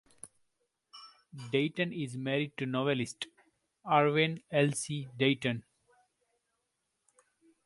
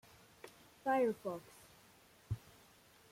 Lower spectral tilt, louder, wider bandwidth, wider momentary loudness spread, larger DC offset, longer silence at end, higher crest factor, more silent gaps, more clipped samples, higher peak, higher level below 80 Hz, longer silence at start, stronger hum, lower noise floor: second, -5 dB/octave vs -6.5 dB/octave; first, -32 LUFS vs -40 LUFS; second, 11.5 kHz vs 16.5 kHz; second, 24 LU vs 27 LU; neither; first, 2.05 s vs 0.75 s; about the same, 22 dB vs 18 dB; neither; neither; first, -12 dBFS vs -24 dBFS; second, -74 dBFS vs -68 dBFS; second, 0.25 s vs 0.45 s; neither; first, -82 dBFS vs -65 dBFS